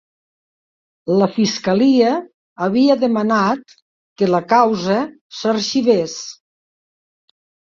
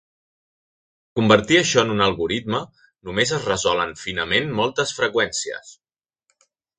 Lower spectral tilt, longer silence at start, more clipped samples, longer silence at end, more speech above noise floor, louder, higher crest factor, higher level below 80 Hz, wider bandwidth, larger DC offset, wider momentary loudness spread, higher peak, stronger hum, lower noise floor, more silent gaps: first, -5.5 dB/octave vs -3.5 dB/octave; about the same, 1.05 s vs 1.15 s; neither; first, 1.4 s vs 1.05 s; first, over 74 dB vs 53 dB; first, -17 LUFS vs -20 LUFS; second, 16 dB vs 22 dB; second, -62 dBFS vs -52 dBFS; second, 7.4 kHz vs 9.6 kHz; neither; about the same, 12 LU vs 12 LU; about the same, -2 dBFS vs 0 dBFS; neither; first, under -90 dBFS vs -74 dBFS; first, 2.34-2.56 s, 3.82-4.16 s, 5.21-5.30 s vs none